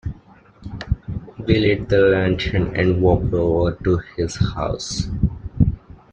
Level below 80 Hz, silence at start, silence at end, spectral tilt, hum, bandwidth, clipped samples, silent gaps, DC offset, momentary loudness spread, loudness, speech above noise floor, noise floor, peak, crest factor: -32 dBFS; 0.05 s; 0.35 s; -6.5 dB/octave; none; 9.2 kHz; under 0.1%; none; under 0.1%; 14 LU; -20 LUFS; 29 dB; -48 dBFS; -2 dBFS; 18 dB